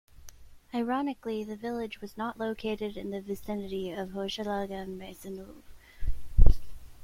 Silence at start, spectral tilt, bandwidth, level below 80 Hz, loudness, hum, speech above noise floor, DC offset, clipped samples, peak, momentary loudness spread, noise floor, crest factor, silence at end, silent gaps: 0.25 s; -6.5 dB/octave; 11 kHz; -32 dBFS; -34 LUFS; none; 14 dB; under 0.1%; under 0.1%; -2 dBFS; 14 LU; -49 dBFS; 26 dB; 0 s; none